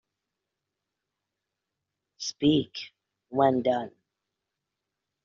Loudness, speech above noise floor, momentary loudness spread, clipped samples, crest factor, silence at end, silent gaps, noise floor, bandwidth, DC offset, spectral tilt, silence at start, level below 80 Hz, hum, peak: -27 LUFS; 60 dB; 17 LU; under 0.1%; 24 dB; 1.35 s; none; -86 dBFS; 7.4 kHz; under 0.1%; -5 dB/octave; 2.2 s; -66 dBFS; none; -8 dBFS